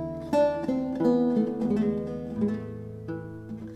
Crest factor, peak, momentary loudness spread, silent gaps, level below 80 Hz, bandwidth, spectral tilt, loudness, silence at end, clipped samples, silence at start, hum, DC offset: 16 dB; -12 dBFS; 14 LU; none; -56 dBFS; 10.5 kHz; -8.5 dB/octave; -27 LUFS; 0 s; under 0.1%; 0 s; none; under 0.1%